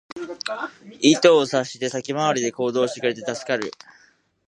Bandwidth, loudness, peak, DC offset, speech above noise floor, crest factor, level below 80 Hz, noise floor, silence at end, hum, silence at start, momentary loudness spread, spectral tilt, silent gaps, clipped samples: 11 kHz; -21 LUFS; -2 dBFS; under 0.1%; 37 dB; 20 dB; -72 dBFS; -58 dBFS; 0.8 s; none; 0.15 s; 15 LU; -3.5 dB/octave; none; under 0.1%